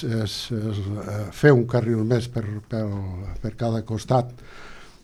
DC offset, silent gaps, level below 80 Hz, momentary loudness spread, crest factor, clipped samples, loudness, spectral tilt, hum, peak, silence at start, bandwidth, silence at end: under 0.1%; none; -46 dBFS; 16 LU; 22 dB; under 0.1%; -24 LUFS; -7 dB/octave; none; -2 dBFS; 0 s; 13 kHz; 0.15 s